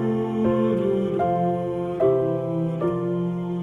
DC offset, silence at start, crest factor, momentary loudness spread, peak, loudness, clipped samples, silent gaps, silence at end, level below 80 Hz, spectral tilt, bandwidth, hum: under 0.1%; 0 s; 14 dB; 5 LU; -8 dBFS; -23 LUFS; under 0.1%; none; 0 s; -54 dBFS; -10 dB/octave; 7.2 kHz; none